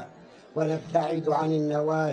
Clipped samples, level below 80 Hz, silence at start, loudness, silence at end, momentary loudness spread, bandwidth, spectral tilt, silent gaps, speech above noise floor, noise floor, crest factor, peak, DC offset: under 0.1%; -74 dBFS; 0 s; -27 LUFS; 0 s; 7 LU; 9.4 kHz; -7.5 dB/octave; none; 23 dB; -49 dBFS; 18 dB; -10 dBFS; under 0.1%